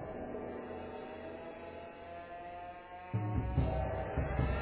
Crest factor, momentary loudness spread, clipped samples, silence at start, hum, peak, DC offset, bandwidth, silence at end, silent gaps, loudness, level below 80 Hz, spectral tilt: 18 dB; 13 LU; under 0.1%; 0 s; none; -20 dBFS; under 0.1%; 4 kHz; 0 s; none; -40 LUFS; -44 dBFS; -7.5 dB/octave